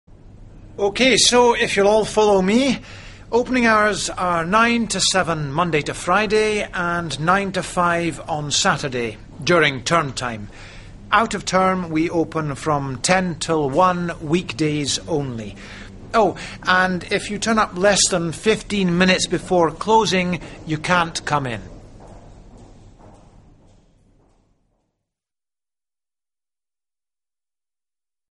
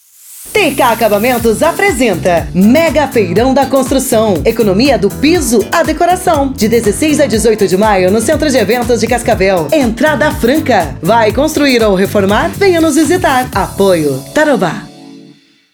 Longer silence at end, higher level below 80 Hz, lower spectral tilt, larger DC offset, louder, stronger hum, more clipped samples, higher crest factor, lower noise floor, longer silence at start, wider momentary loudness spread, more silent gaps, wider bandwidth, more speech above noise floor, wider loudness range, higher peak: first, 5.65 s vs 0.55 s; second, -44 dBFS vs -30 dBFS; about the same, -3.5 dB/octave vs -4.5 dB/octave; neither; second, -19 LUFS vs -10 LUFS; neither; neither; first, 20 dB vs 10 dB; first, under -90 dBFS vs -41 dBFS; second, 0.1 s vs 0.3 s; first, 11 LU vs 3 LU; neither; second, 11.5 kHz vs over 20 kHz; first, over 71 dB vs 32 dB; first, 4 LU vs 1 LU; about the same, 0 dBFS vs 0 dBFS